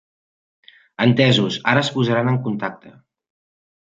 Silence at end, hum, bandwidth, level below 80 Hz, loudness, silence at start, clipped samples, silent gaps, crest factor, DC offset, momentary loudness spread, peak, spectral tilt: 1.05 s; none; 7.8 kHz; -60 dBFS; -18 LUFS; 1 s; under 0.1%; none; 20 dB; under 0.1%; 10 LU; -2 dBFS; -6 dB/octave